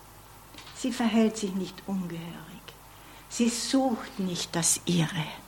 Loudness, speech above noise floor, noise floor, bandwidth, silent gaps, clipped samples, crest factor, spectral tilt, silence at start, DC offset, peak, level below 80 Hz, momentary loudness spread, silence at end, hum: -28 LUFS; 22 dB; -50 dBFS; 18 kHz; none; under 0.1%; 18 dB; -4 dB/octave; 0 s; under 0.1%; -12 dBFS; -58 dBFS; 22 LU; 0 s; none